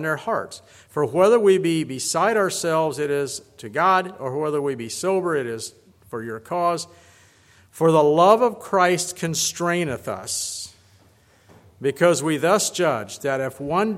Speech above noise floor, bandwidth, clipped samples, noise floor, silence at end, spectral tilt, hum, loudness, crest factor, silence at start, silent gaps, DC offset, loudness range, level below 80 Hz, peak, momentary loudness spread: 35 dB; 16 kHz; under 0.1%; -56 dBFS; 0 s; -4 dB/octave; none; -21 LUFS; 20 dB; 0 s; none; under 0.1%; 6 LU; -64 dBFS; -2 dBFS; 15 LU